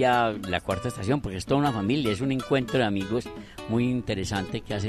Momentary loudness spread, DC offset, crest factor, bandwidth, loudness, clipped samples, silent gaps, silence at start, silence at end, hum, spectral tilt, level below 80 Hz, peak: 6 LU; under 0.1%; 16 dB; 13 kHz; -27 LUFS; under 0.1%; none; 0 s; 0 s; none; -6 dB/octave; -48 dBFS; -10 dBFS